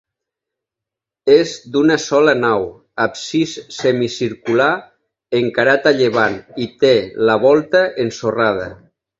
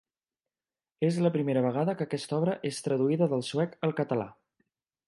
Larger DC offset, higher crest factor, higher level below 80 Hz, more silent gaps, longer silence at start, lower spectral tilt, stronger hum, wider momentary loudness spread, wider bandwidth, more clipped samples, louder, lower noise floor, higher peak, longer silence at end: neither; about the same, 16 dB vs 18 dB; first, -54 dBFS vs -76 dBFS; neither; first, 1.25 s vs 1 s; second, -5 dB/octave vs -7 dB/octave; neither; first, 9 LU vs 6 LU; second, 7.8 kHz vs 11.5 kHz; neither; first, -16 LUFS vs -29 LUFS; second, -85 dBFS vs under -90 dBFS; first, 0 dBFS vs -12 dBFS; second, 0.45 s vs 0.75 s